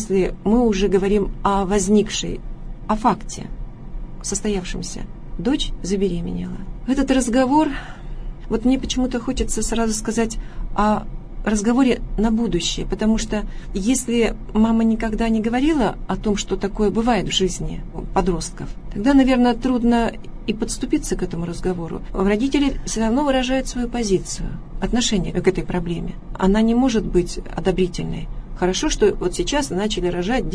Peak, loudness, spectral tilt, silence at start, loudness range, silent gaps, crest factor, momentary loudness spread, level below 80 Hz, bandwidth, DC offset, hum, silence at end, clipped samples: -2 dBFS; -21 LUFS; -5 dB/octave; 0 s; 3 LU; none; 18 dB; 13 LU; -30 dBFS; 11 kHz; under 0.1%; none; 0 s; under 0.1%